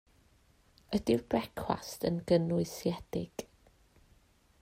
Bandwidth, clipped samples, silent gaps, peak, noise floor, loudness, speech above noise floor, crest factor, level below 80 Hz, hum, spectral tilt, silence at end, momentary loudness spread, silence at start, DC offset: 16 kHz; under 0.1%; none; -14 dBFS; -66 dBFS; -33 LUFS; 34 dB; 20 dB; -60 dBFS; none; -6.5 dB/octave; 1.2 s; 10 LU; 0.9 s; under 0.1%